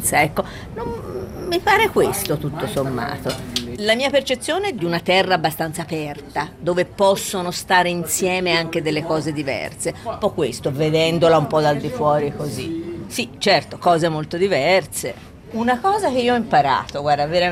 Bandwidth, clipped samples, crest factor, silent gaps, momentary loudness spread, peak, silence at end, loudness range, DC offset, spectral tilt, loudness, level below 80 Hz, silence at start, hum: 16 kHz; under 0.1%; 18 dB; none; 11 LU; -2 dBFS; 0 s; 2 LU; under 0.1%; -4 dB/octave; -20 LUFS; -46 dBFS; 0 s; none